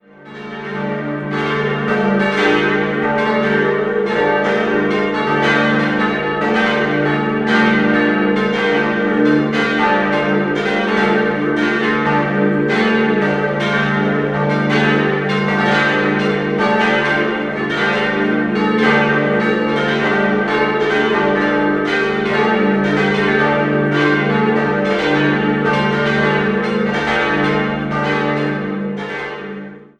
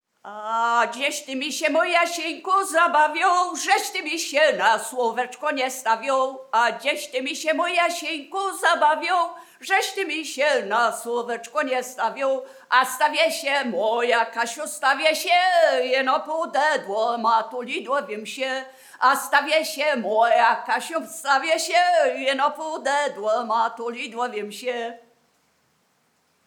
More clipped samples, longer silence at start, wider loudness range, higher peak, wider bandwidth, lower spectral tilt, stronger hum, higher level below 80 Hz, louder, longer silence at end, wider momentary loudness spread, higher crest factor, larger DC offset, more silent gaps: neither; about the same, 0.2 s vs 0.25 s; about the same, 1 LU vs 3 LU; about the same, -2 dBFS vs -4 dBFS; second, 9.2 kHz vs 19 kHz; first, -6.5 dB/octave vs -1 dB/octave; neither; first, -46 dBFS vs under -90 dBFS; first, -15 LUFS vs -22 LUFS; second, 0.15 s vs 1.5 s; second, 5 LU vs 9 LU; second, 14 dB vs 20 dB; neither; neither